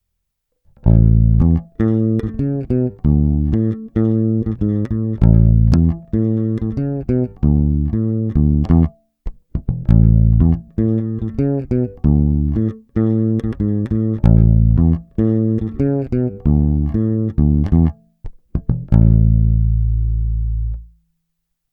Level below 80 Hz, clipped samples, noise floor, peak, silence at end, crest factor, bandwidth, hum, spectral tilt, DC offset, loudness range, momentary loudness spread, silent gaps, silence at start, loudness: -20 dBFS; under 0.1%; -74 dBFS; 0 dBFS; 0.85 s; 16 dB; 2.7 kHz; none; -12 dB/octave; under 0.1%; 2 LU; 9 LU; none; 0.85 s; -17 LUFS